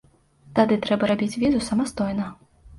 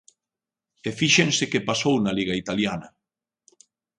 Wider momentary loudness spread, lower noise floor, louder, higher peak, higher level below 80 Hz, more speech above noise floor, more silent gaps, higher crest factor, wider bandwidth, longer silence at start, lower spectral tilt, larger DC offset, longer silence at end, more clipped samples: second, 7 LU vs 14 LU; second, -53 dBFS vs -89 dBFS; about the same, -23 LUFS vs -22 LUFS; about the same, -4 dBFS vs -4 dBFS; first, -50 dBFS vs -58 dBFS; second, 31 dB vs 66 dB; neither; about the same, 18 dB vs 22 dB; about the same, 11.5 kHz vs 11 kHz; second, 0.45 s vs 0.85 s; first, -6 dB/octave vs -3.5 dB/octave; neither; second, 0 s vs 1.1 s; neither